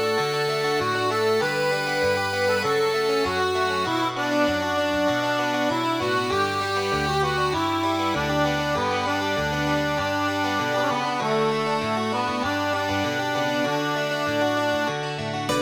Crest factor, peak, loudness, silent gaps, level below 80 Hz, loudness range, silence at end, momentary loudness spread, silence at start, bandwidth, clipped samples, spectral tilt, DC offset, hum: 14 dB; -10 dBFS; -23 LUFS; none; -50 dBFS; 1 LU; 0 s; 2 LU; 0 s; over 20 kHz; under 0.1%; -4.5 dB/octave; under 0.1%; none